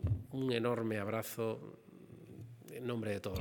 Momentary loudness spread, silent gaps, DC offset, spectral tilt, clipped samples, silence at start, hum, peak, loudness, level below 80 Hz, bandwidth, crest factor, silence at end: 19 LU; none; under 0.1%; -6.5 dB/octave; under 0.1%; 0 s; none; -20 dBFS; -38 LUFS; -60 dBFS; over 20 kHz; 20 dB; 0 s